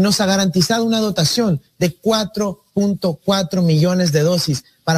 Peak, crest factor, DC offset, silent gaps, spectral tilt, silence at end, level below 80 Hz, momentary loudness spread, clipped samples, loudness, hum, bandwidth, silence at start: -2 dBFS; 14 dB; under 0.1%; none; -5 dB/octave; 0 s; -50 dBFS; 7 LU; under 0.1%; -17 LUFS; none; 16 kHz; 0 s